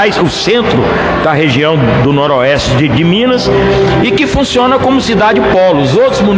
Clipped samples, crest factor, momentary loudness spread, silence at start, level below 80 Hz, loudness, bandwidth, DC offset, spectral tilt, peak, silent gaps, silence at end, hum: under 0.1%; 8 dB; 2 LU; 0 s; -28 dBFS; -9 LUFS; 9.8 kHz; under 0.1%; -6 dB/octave; 0 dBFS; none; 0 s; none